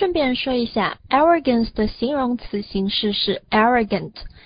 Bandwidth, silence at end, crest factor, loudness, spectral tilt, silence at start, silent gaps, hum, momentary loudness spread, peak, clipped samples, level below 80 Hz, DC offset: 5.2 kHz; 0.05 s; 16 dB; -20 LUFS; -10 dB/octave; 0 s; none; none; 8 LU; -4 dBFS; under 0.1%; -42 dBFS; under 0.1%